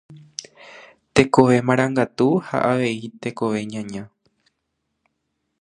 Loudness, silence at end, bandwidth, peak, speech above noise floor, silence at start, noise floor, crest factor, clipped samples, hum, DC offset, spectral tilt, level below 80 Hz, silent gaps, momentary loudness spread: -20 LUFS; 1.55 s; 10.5 kHz; 0 dBFS; 56 dB; 0.1 s; -76 dBFS; 22 dB; under 0.1%; none; under 0.1%; -6 dB/octave; -54 dBFS; none; 20 LU